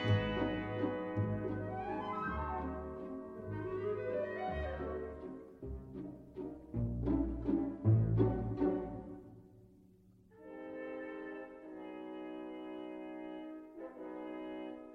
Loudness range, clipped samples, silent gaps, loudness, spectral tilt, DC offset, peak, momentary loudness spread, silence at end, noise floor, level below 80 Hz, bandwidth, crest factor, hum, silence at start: 11 LU; under 0.1%; none; -39 LUFS; -9.5 dB/octave; under 0.1%; -18 dBFS; 15 LU; 0 s; -64 dBFS; -52 dBFS; 4.7 kHz; 20 dB; none; 0 s